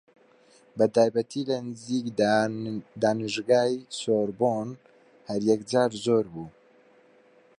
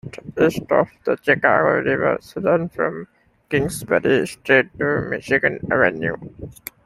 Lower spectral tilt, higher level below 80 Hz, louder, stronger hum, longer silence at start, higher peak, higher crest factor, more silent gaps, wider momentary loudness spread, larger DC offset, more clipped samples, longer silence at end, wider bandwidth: about the same, -5.5 dB/octave vs -5.5 dB/octave; second, -68 dBFS vs -52 dBFS; second, -26 LUFS vs -19 LUFS; neither; first, 0.75 s vs 0.05 s; second, -8 dBFS vs -2 dBFS; about the same, 18 dB vs 18 dB; neither; about the same, 11 LU vs 10 LU; neither; neither; first, 1.1 s vs 0.35 s; second, 11 kHz vs 15.5 kHz